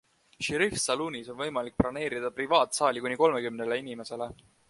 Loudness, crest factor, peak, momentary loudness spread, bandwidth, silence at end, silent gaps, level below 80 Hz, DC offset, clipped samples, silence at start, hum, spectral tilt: -29 LUFS; 22 dB; -8 dBFS; 11 LU; 11.5 kHz; 0.35 s; none; -56 dBFS; under 0.1%; under 0.1%; 0.4 s; none; -3.5 dB/octave